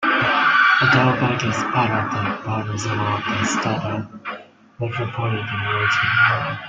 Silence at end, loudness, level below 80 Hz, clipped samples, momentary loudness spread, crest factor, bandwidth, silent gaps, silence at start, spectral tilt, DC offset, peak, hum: 0 s; -19 LUFS; -54 dBFS; under 0.1%; 13 LU; 16 dB; 9.2 kHz; none; 0 s; -4.5 dB/octave; under 0.1%; -4 dBFS; none